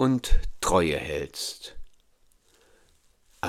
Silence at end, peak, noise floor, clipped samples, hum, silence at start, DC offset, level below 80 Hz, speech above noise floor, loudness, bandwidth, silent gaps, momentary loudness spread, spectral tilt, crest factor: 0 s; -6 dBFS; -62 dBFS; under 0.1%; none; 0 s; under 0.1%; -32 dBFS; 38 dB; -27 LUFS; 15 kHz; none; 13 LU; -4.5 dB/octave; 20 dB